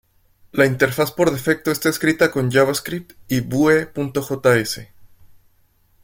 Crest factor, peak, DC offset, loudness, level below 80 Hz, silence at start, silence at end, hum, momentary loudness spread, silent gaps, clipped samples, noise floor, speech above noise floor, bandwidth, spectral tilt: 18 dB; -2 dBFS; under 0.1%; -19 LUFS; -52 dBFS; 0.55 s; 0.95 s; none; 9 LU; none; under 0.1%; -59 dBFS; 40 dB; 17 kHz; -5 dB/octave